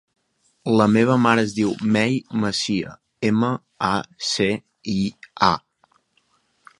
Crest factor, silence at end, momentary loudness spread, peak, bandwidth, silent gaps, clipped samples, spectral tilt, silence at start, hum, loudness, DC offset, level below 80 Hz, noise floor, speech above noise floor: 22 dB; 1.2 s; 11 LU; 0 dBFS; 11.5 kHz; none; under 0.1%; -5.5 dB/octave; 0.65 s; none; -21 LUFS; under 0.1%; -54 dBFS; -65 dBFS; 45 dB